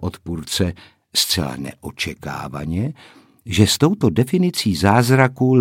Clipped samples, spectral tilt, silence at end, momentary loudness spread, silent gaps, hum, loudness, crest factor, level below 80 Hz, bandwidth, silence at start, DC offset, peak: under 0.1%; -5 dB/octave; 0 s; 13 LU; none; none; -19 LUFS; 18 dB; -44 dBFS; 17 kHz; 0 s; under 0.1%; 0 dBFS